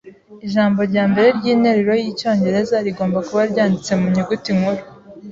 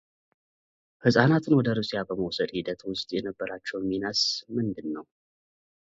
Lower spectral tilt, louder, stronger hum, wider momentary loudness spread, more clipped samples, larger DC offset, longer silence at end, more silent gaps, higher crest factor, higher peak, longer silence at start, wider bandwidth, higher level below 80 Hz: about the same, -6.5 dB/octave vs -5.5 dB/octave; first, -17 LUFS vs -27 LUFS; neither; second, 6 LU vs 12 LU; neither; neither; second, 0 s vs 0.95 s; neither; second, 14 dB vs 24 dB; about the same, -2 dBFS vs -4 dBFS; second, 0.05 s vs 1.05 s; about the same, 7.6 kHz vs 7.8 kHz; first, -54 dBFS vs -62 dBFS